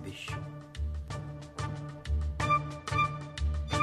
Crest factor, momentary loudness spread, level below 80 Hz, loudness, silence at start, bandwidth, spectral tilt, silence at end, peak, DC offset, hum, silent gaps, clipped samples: 18 dB; 11 LU; -38 dBFS; -34 LUFS; 0 s; 12 kHz; -5.5 dB/octave; 0 s; -16 dBFS; under 0.1%; none; none; under 0.1%